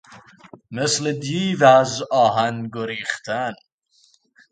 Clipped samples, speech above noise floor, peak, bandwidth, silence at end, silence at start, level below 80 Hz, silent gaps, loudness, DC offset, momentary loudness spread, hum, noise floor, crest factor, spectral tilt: under 0.1%; 40 dB; 0 dBFS; 9.4 kHz; 0.95 s; 0.1 s; -64 dBFS; none; -20 LUFS; under 0.1%; 14 LU; none; -60 dBFS; 22 dB; -4 dB/octave